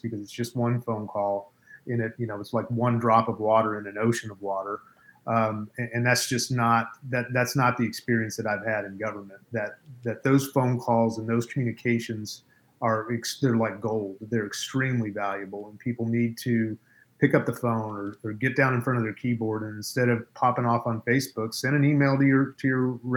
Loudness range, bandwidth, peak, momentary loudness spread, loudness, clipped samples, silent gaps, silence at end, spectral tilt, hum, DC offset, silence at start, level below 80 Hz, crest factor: 3 LU; over 20 kHz; -6 dBFS; 11 LU; -26 LUFS; under 0.1%; none; 0 s; -6 dB/octave; none; under 0.1%; 0.05 s; -68 dBFS; 20 dB